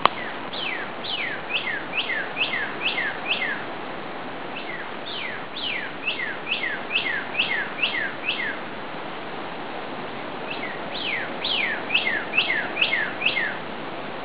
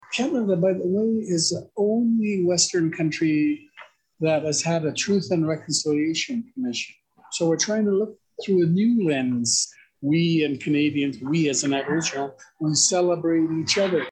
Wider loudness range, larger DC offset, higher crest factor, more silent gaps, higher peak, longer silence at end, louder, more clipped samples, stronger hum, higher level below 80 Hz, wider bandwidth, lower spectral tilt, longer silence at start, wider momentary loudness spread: first, 6 LU vs 2 LU; first, 1% vs under 0.1%; first, 28 dB vs 16 dB; neither; first, 0 dBFS vs -6 dBFS; about the same, 0 s vs 0 s; about the same, -25 LUFS vs -23 LUFS; neither; neither; first, -62 dBFS vs -68 dBFS; second, 4 kHz vs 10.5 kHz; second, 0.5 dB/octave vs -4 dB/octave; about the same, 0 s vs 0.1 s; about the same, 11 LU vs 9 LU